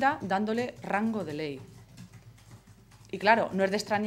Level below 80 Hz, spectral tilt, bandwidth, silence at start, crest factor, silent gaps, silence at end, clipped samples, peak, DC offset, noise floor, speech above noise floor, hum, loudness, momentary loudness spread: -64 dBFS; -5.5 dB/octave; 15 kHz; 0 s; 24 dB; none; 0 s; under 0.1%; -6 dBFS; under 0.1%; -55 dBFS; 26 dB; none; -29 LUFS; 26 LU